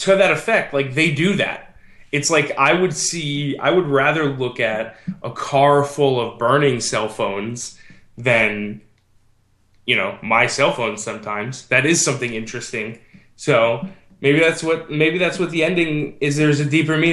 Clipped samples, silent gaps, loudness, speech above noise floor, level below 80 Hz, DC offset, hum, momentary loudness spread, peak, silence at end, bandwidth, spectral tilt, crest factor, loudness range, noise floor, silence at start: under 0.1%; none; -18 LUFS; 39 dB; -56 dBFS; under 0.1%; none; 12 LU; -2 dBFS; 0 s; 12.5 kHz; -4 dB/octave; 18 dB; 2 LU; -58 dBFS; 0 s